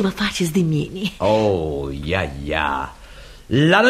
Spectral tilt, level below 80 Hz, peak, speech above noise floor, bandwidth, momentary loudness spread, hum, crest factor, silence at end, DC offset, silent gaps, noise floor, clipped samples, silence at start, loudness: -5.5 dB/octave; -38 dBFS; 0 dBFS; 21 dB; 15 kHz; 8 LU; none; 20 dB; 0 s; under 0.1%; none; -40 dBFS; under 0.1%; 0 s; -21 LUFS